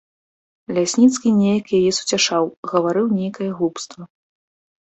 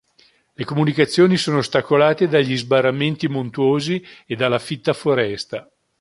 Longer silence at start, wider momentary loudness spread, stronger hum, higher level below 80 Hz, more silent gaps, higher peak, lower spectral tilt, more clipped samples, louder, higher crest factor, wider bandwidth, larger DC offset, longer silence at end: about the same, 0.7 s vs 0.6 s; about the same, 10 LU vs 11 LU; neither; about the same, -62 dBFS vs -60 dBFS; first, 2.57-2.63 s vs none; about the same, -4 dBFS vs -2 dBFS; second, -4.5 dB/octave vs -6 dB/octave; neither; about the same, -18 LUFS vs -19 LUFS; about the same, 16 dB vs 18 dB; second, 8.4 kHz vs 11.5 kHz; neither; first, 0.8 s vs 0.4 s